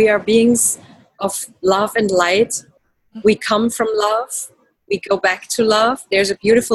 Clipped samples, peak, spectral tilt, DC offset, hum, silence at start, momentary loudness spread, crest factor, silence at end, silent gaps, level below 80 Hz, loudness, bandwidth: under 0.1%; -2 dBFS; -3 dB/octave; under 0.1%; none; 0 s; 11 LU; 16 dB; 0 s; none; -54 dBFS; -17 LUFS; 13.5 kHz